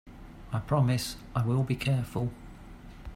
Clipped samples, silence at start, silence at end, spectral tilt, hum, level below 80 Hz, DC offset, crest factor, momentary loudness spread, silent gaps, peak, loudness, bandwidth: under 0.1%; 0.05 s; 0 s; -6.5 dB/octave; none; -48 dBFS; under 0.1%; 18 dB; 22 LU; none; -14 dBFS; -30 LUFS; 16 kHz